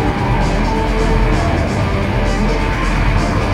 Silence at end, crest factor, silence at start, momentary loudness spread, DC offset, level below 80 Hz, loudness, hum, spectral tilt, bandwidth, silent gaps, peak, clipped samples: 0 s; 12 dB; 0 s; 2 LU; under 0.1%; -18 dBFS; -16 LUFS; none; -6.5 dB/octave; 11 kHz; none; -2 dBFS; under 0.1%